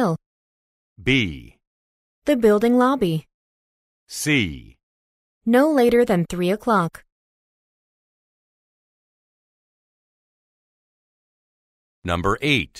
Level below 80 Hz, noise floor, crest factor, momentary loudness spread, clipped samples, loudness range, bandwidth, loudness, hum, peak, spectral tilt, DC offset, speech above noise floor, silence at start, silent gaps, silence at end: -48 dBFS; under -90 dBFS; 20 dB; 13 LU; under 0.1%; 8 LU; 15.5 kHz; -20 LUFS; none; -4 dBFS; -5.5 dB/octave; under 0.1%; over 71 dB; 0 s; 0.26-0.96 s, 1.67-2.22 s, 3.34-4.07 s, 4.83-5.41 s, 7.12-12.02 s; 0 s